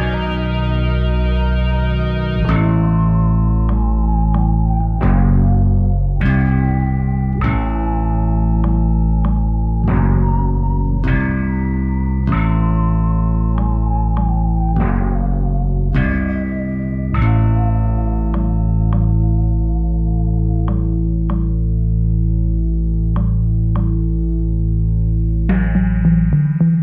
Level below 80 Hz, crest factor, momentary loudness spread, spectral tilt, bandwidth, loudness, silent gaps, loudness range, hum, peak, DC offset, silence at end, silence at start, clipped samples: -18 dBFS; 12 dB; 4 LU; -11 dB/octave; 4.3 kHz; -17 LUFS; none; 2 LU; none; -2 dBFS; under 0.1%; 0 s; 0 s; under 0.1%